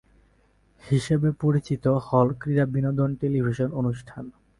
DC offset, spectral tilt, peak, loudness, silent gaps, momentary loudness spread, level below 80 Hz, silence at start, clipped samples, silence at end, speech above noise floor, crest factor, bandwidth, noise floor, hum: under 0.1%; -8.5 dB/octave; -6 dBFS; -24 LUFS; none; 6 LU; -52 dBFS; 0.85 s; under 0.1%; 0.3 s; 38 dB; 20 dB; 11.5 kHz; -62 dBFS; none